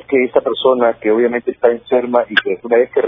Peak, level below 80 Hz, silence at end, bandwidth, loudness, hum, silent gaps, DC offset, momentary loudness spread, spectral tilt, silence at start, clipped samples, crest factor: 0 dBFS; -58 dBFS; 0 s; 5.4 kHz; -15 LUFS; none; none; under 0.1%; 3 LU; -7 dB/octave; 0.1 s; under 0.1%; 14 dB